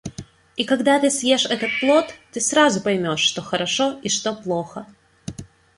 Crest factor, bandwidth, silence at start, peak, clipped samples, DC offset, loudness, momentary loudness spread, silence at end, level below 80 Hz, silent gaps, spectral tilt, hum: 18 dB; 11.5 kHz; 0.05 s; -4 dBFS; under 0.1%; under 0.1%; -20 LUFS; 19 LU; 0.35 s; -56 dBFS; none; -3 dB/octave; none